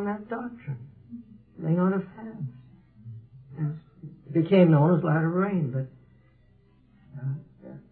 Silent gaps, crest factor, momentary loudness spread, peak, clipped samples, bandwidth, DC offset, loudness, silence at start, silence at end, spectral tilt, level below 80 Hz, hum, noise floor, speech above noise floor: none; 20 dB; 26 LU; -8 dBFS; under 0.1%; 4.3 kHz; under 0.1%; -26 LUFS; 0 s; 0.1 s; -12.5 dB/octave; -66 dBFS; none; -60 dBFS; 36 dB